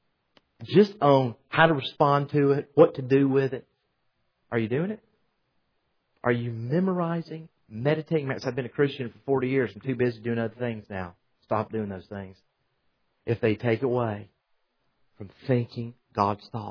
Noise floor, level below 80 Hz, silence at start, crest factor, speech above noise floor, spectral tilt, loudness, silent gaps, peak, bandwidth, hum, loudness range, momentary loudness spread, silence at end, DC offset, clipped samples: -74 dBFS; -66 dBFS; 0.6 s; 22 dB; 49 dB; -8.5 dB/octave; -26 LUFS; none; -4 dBFS; 5.4 kHz; none; 9 LU; 18 LU; 0 s; under 0.1%; under 0.1%